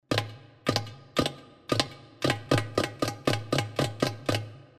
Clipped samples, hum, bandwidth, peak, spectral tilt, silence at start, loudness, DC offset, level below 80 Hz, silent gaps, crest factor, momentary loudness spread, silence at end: under 0.1%; none; 15.5 kHz; -6 dBFS; -4.5 dB/octave; 0.1 s; -30 LUFS; under 0.1%; -54 dBFS; none; 24 dB; 6 LU; 0.15 s